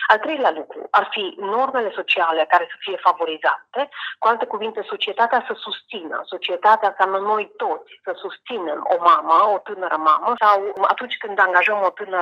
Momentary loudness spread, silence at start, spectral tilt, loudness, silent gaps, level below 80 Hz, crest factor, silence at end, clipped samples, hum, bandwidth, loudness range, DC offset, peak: 12 LU; 0 s; -4 dB/octave; -20 LUFS; none; -76 dBFS; 20 dB; 0 s; under 0.1%; none; 13 kHz; 4 LU; under 0.1%; 0 dBFS